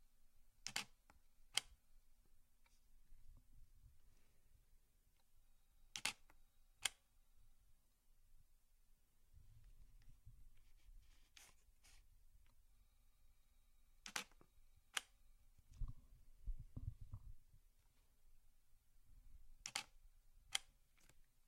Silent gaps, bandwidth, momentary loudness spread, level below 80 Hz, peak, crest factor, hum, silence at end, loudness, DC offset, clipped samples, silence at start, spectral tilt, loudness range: none; 16 kHz; 20 LU; -62 dBFS; -20 dBFS; 36 dB; none; 0 s; -49 LUFS; under 0.1%; under 0.1%; 0 s; -0.5 dB/octave; 8 LU